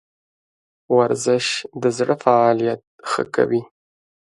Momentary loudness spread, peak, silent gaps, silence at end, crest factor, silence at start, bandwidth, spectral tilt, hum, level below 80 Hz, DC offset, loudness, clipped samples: 9 LU; 0 dBFS; 2.87-2.99 s; 0.7 s; 20 dB; 0.9 s; 11.5 kHz; -4.5 dB/octave; none; -66 dBFS; under 0.1%; -19 LUFS; under 0.1%